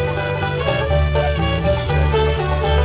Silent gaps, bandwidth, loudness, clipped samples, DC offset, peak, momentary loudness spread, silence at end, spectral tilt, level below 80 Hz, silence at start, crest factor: none; 4 kHz; -18 LUFS; under 0.1%; 0.2%; -4 dBFS; 3 LU; 0 s; -10.5 dB/octave; -22 dBFS; 0 s; 12 dB